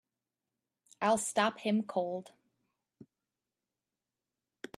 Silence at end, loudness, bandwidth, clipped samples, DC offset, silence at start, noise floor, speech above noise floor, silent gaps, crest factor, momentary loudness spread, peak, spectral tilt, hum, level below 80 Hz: 2.5 s; -33 LUFS; 14 kHz; under 0.1%; under 0.1%; 1 s; under -90 dBFS; over 58 dB; none; 24 dB; 11 LU; -14 dBFS; -4 dB/octave; none; -82 dBFS